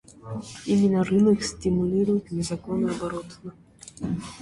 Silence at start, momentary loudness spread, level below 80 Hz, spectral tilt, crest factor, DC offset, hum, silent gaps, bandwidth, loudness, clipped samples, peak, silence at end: 0.25 s; 17 LU; -50 dBFS; -6.5 dB/octave; 16 dB; under 0.1%; none; none; 11.5 kHz; -25 LUFS; under 0.1%; -10 dBFS; 0 s